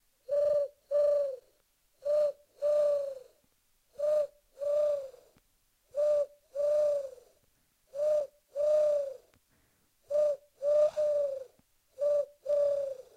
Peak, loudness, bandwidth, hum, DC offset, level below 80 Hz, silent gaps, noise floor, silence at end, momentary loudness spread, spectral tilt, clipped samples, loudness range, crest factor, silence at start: -18 dBFS; -31 LUFS; 9.4 kHz; none; under 0.1%; -74 dBFS; none; -72 dBFS; 0.15 s; 13 LU; -3.5 dB/octave; under 0.1%; 3 LU; 14 dB; 0.3 s